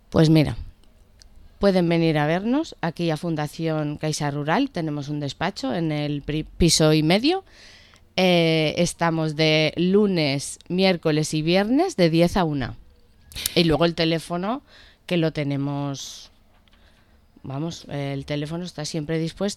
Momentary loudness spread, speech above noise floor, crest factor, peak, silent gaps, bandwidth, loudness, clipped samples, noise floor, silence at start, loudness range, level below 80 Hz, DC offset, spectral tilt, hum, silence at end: 12 LU; 34 dB; 20 dB; -2 dBFS; none; 15 kHz; -22 LUFS; under 0.1%; -55 dBFS; 0.1 s; 9 LU; -44 dBFS; under 0.1%; -5.5 dB/octave; none; 0 s